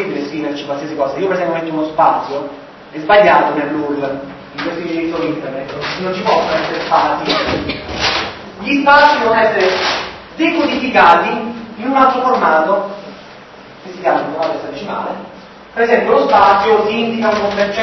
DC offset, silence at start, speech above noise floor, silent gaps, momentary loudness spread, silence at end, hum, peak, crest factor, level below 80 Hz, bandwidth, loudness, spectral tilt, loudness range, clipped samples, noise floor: under 0.1%; 0 s; 23 dB; none; 16 LU; 0 s; none; 0 dBFS; 14 dB; -46 dBFS; 7.4 kHz; -14 LUFS; -5 dB/octave; 6 LU; under 0.1%; -36 dBFS